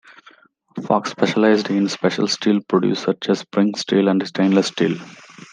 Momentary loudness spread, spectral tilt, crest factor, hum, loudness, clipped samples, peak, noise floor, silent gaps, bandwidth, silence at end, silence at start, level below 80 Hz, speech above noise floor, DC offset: 5 LU; -5.5 dB/octave; 18 dB; none; -19 LUFS; under 0.1%; -2 dBFS; -51 dBFS; none; 9.6 kHz; 0.4 s; 0.75 s; -68 dBFS; 33 dB; under 0.1%